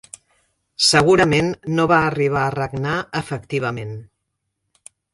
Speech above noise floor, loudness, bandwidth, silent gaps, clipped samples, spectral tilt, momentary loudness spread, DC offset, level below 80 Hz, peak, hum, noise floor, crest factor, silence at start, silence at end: 58 dB; -18 LUFS; 11.5 kHz; none; under 0.1%; -4.5 dB/octave; 14 LU; under 0.1%; -48 dBFS; 0 dBFS; none; -76 dBFS; 20 dB; 0.8 s; 1.1 s